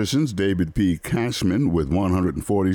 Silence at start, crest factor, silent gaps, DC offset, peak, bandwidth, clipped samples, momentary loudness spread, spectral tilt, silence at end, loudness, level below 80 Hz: 0 s; 10 dB; none; under 0.1%; -10 dBFS; over 20 kHz; under 0.1%; 2 LU; -6.5 dB/octave; 0 s; -22 LUFS; -38 dBFS